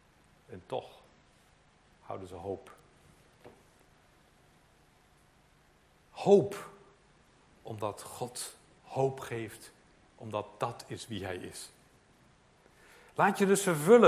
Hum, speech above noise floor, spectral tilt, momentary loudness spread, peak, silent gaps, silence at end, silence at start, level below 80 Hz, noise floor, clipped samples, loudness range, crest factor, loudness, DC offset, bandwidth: none; 35 dB; -5 dB/octave; 25 LU; -8 dBFS; none; 0 s; 0.5 s; -68 dBFS; -65 dBFS; under 0.1%; 15 LU; 26 dB; -33 LUFS; under 0.1%; 16 kHz